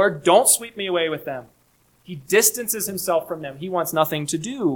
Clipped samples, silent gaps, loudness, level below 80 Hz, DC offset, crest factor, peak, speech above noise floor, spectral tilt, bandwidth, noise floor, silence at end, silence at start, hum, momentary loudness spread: under 0.1%; none; -20 LUFS; -64 dBFS; under 0.1%; 20 dB; -2 dBFS; 39 dB; -3 dB/octave; 19 kHz; -61 dBFS; 0 s; 0 s; none; 16 LU